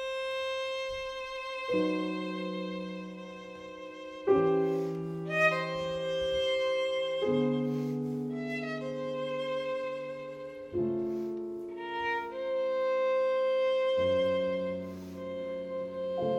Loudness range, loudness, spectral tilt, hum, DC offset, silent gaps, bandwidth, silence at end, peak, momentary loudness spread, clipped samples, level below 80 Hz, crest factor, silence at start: 5 LU; -32 LUFS; -6 dB/octave; none; under 0.1%; none; 10.5 kHz; 0 s; -12 dBFS; 12 LU; under 0.1%; -64 dBFS; 20 dB; 0 s